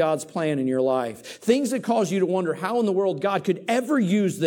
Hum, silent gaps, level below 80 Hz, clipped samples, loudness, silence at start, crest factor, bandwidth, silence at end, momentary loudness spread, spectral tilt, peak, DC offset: none; none; -74 dBFS; under 0.1%; -24 LUFS; 0 s; 16 dB; 17.5 kHz; 0 s; 4 LU; -6 dB/octave; -6 dBFS; under 0.1%